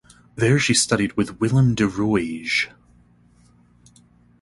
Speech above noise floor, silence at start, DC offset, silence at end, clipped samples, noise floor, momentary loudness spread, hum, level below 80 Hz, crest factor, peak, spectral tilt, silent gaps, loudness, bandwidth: 35 dB; 0.35 s; under 0.1%; 1.75 s; under 0.1%; -55 dBFS; 6 LU; none; -50 dBFS; 18 dB; -4 dBFS; -4.5 dB/octave; none; -20 LUFS; 11.5 kHz